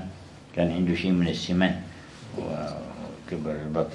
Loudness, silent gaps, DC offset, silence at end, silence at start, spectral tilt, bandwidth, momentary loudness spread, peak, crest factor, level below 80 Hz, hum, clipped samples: -28 LUFS; none; under 0.1%; 0 s; 0 s; -6.5 dB/octave; 10.5 kHz; 16 LU; -6 dBFS; 22 dB; -54 dBFS; none; under 0.1%